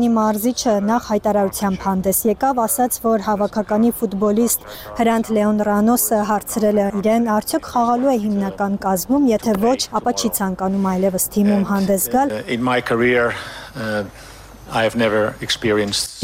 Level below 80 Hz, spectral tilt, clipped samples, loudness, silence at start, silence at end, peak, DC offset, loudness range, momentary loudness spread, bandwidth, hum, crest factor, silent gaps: -46 dBFS; -4.5 dB/octave; under 0.1%; -18 LUFS; 0 s; 0 s; -6 dBFS; under 0.1%; 2 LU; 5 LU; 16.5 kHz; none; 12 dB; none